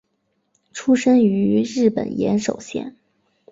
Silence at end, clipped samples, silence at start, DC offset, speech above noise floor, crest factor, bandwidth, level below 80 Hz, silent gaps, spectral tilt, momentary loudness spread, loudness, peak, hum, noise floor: 0.6 s; under 0.1%; 0.75 s; under 0.1%; 52 dB; 16 dB; 7.8 kHz; -58 dBFS; none; -6 dB/octave; 15 LU; -19 LUFS; -4 dBFS; none; -70 dBFS